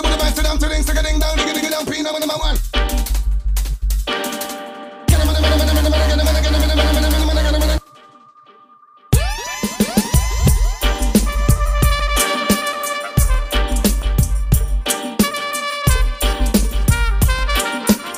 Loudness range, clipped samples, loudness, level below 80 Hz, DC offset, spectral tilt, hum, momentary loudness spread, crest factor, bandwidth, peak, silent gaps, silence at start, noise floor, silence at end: 4 LU; under 0.1%; -18 LUFS; -18 dBFS; under 0.1%; -4.5 dB/octave; none; 6 LU; 16 dB; 16.5 kHz; 0 dBFS; none; 0 s; -47 dBFS; 0 s